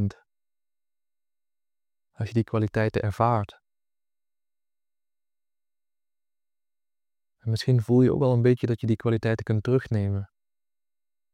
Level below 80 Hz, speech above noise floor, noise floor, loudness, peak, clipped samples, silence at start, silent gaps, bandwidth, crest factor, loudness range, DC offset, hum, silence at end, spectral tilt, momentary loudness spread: -58 dBFS; over 67 dB; under -90 dBFS; -25 LUFS; -8 dBFS; under 0.1%; 0 s; none; 10 kHz; 20 dB; 9 LU; under 0.1%; none; 1.1 s; -8.5 dB/octave; 11 LU